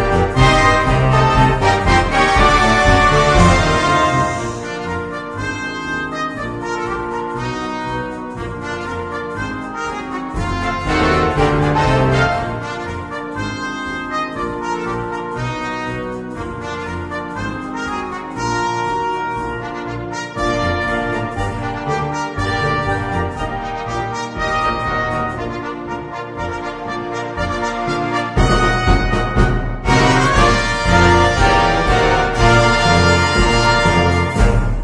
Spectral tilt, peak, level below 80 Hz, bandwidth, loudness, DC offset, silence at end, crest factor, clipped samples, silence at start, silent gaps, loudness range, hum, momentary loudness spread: -5 dB/octave; 0 dBFS; -26 dBFS; 10.5 kHz; -17 LUFS; under 0.1%; 0 s; 16 dB; under 0.1%; 0 s; none; 10 LU; none; 13 LU